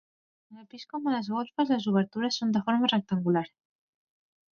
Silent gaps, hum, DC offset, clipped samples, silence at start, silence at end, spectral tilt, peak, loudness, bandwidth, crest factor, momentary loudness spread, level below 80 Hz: none; none; under 0.1%; under 0.1%; 0.5 s; 1.05 s; -6 dB/octave; -12 dBFS; -28 LUFS; 7 kHz; 18 dB; 14 LU; -74 dBFS